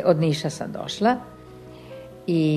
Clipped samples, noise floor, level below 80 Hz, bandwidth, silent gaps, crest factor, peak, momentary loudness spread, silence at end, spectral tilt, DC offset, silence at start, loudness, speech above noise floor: under 0.1%; -43 dBFS; -58 dBFS; 13 kHz; none; 18 dB; -6 dBFS; 21 LU; 0 s; -6.5 dB/octave; under 0.1%; 0 s; -24 LUFS; 21 dB